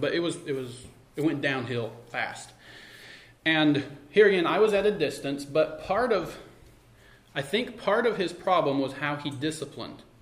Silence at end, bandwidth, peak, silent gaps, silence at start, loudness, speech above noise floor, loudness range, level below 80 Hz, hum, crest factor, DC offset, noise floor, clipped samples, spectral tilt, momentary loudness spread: 0.2 s; 15 kHz; -8 dBFS; none; 0 s; -27 LUFS; 29 dB; 5 LU; -60 dBFS; none; 20 dB; under 0.1%; -55 dBFS; under 0.1%; -5 dB/octave; 20 LU